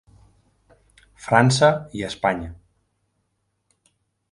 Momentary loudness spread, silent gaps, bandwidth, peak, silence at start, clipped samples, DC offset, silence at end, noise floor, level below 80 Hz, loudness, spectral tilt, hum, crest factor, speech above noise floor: 18 LU; none; 11.5 kHz; -2 dBFS; 1.2 s; under 0.1%; under 0.1%; 1.8 s; -73 dBFS; -50 dBFS; -20 LUFS; -5 dB/octave; none; 24 dB; 53 dB